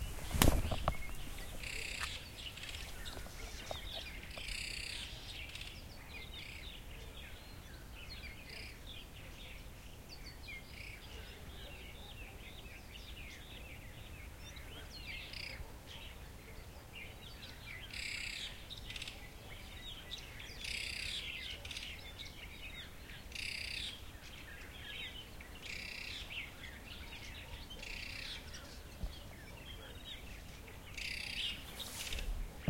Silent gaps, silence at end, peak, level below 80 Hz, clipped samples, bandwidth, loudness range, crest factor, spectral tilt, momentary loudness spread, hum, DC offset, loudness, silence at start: none; 0 s; -6 dBFS; -50 dBFS; under 0.1%; 16.5 kHz; 7 LU; 38 dB; -3 dB/octave; 11 LU; none; under 0.1%; -45 LUFS; 0 s